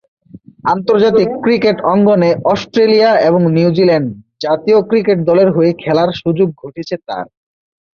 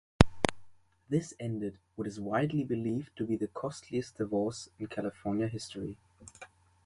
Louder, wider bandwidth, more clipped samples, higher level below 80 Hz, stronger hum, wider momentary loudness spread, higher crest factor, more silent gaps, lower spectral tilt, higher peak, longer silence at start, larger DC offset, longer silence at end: first, -12 LUFS vs -34 LUFS; second, 6.8 kHz vs 11.5 kHz; neither; about the same, -52 dBFS vs -48 dBFS; neither; about the same, 13 LU vs 12 LU; second, 12 dB vs 34 dB; neither; first, -7.5 dB/octave vs -6 dB/octave; about the same, 0 dBFS vs 0 dBFS; first, 0.35 s vs 0.2 s; neither; first, 0.7 s vs 0.4 s